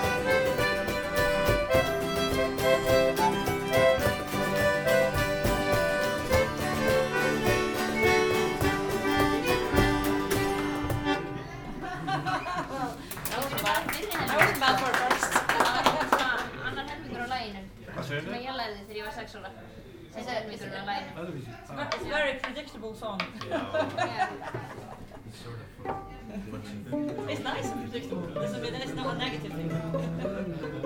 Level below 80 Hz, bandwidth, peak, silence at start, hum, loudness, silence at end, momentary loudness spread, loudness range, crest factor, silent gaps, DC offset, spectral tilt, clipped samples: -44 dBFS; over 20 kHz; -6 dBFS; 0 s; none; -28 LUFS; 0 s; 15 LU; 11 LU; 22 dB; none; under 0.1%; -4.5 dB/octave; under 0.1%